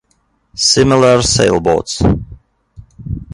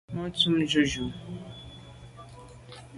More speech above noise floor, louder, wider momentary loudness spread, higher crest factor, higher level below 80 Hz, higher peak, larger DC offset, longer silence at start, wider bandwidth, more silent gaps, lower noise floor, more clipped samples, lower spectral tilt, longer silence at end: first, 49 dB vs 21 dB; first, -12 LUFS vs -26 LUFS; second, 17 LU vs 24 LU; second, 14 dB vs 22 dB; first, -30 dBFS vs -52 dBFS; first, 0 dBFS vs -10 dBFS; neither; first, 0.55 s vs 0.1 s; about the same, 11.5 kHz vs 11.5 kHz; neither; first, -60 dBFS vs -47 dBFS; neither; about the same, -4 dB/octave vs -4.5 dB/octave; about the same, 0.1 s vs 0 s